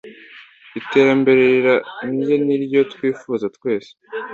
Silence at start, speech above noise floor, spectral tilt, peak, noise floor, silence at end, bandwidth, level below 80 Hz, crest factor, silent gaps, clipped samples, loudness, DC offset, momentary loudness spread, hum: 0.05 s; 26 dB; -7 dB/octave; -2 dBFS; -43 dBFS; 0 s; 7.2 kHz; -62 dBFS; 16 dB; none; under 0.1%; -17 LUFS; under 0.1%; 15 LU; none